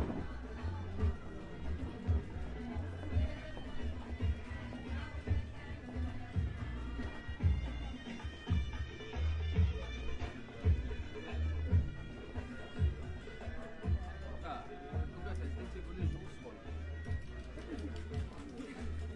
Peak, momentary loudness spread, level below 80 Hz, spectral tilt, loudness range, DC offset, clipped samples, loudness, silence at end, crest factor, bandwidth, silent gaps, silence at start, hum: -20 dBFS; 11 LU; -44 dBFS; -7.5 dB/octave; 5 LU; under 0.1%; under 0.1%; -41 LUFS; 0 s; 18 dB; 8.4 kHz; none; 0 s; none